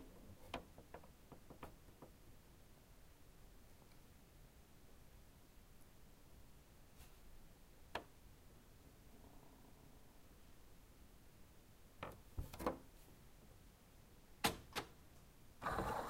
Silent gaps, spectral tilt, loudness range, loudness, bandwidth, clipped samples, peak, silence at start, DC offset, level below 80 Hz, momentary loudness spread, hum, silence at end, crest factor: none; -4 dB/octave; 17 LU; -50 LUFS; 16 kHz; under 0.1%; -22 dBFS; 0 s; under 0.1%; -64 dBFS; 20 LU; none; 0 s; 32 dB